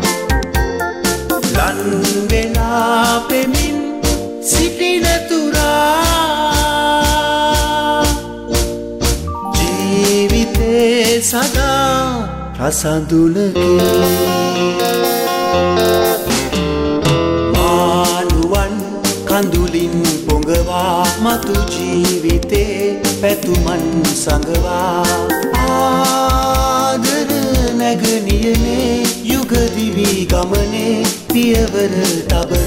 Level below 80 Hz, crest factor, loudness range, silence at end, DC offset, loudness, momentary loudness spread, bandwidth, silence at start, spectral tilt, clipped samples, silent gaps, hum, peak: -24 dBFS; 12 dB; 2 LU; 0 s; under 0.1%; -14 LUFS; 5 LU; 16.5 kHz; 0 s; -4.5 dB/octave; under 0.1%; none; none; -2 dBFS